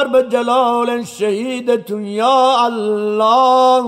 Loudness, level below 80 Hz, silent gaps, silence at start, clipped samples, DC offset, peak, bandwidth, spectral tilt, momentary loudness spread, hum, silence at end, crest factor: -15 LUFS; -66 dBFS; none; 0 s; under 0.1%; under 0.1%; -4 dBFS; 14 kHz; -4.5 dB/octave; 8 LU; none; 0 s; 10 dB